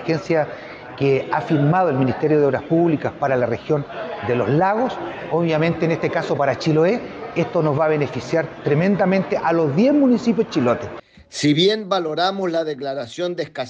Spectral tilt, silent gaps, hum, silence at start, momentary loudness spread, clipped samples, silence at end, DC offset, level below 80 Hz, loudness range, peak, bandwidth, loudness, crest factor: -6.5 dB/octave; none; none; 0 s; 9 LU; under 0.1%; 0 s; under 0.1%; -56 dBFS; 2 LU; -6 dBFS; 9.2 kHz; -20 LUFS; 14 dB